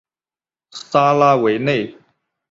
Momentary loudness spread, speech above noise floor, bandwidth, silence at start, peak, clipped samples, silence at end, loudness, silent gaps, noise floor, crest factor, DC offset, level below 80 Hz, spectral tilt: 20 LU; over 75 dB; 7.8 kHz; 0.75 s; -2 dBFS; under 0.1%; 0.6 s; -16 LUFS; none; under -90 dBFS; 16 dB; under 0.1%; -60 dBFS; -6 dB/octave